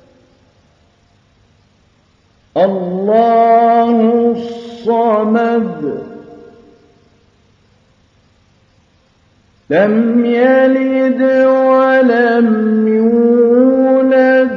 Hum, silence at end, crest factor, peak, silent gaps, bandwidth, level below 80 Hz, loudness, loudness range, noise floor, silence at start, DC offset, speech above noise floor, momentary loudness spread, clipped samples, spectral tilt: none; 0 s; 12 dB; 0 dBFS; none; 6 kHz; -60 dBFS; -11 LUFS; 10 LU; -53 dBFS; 2.55 s; under 0.1%; 43 dB; 9 LU; under 0.1%; -8.5 dB/octave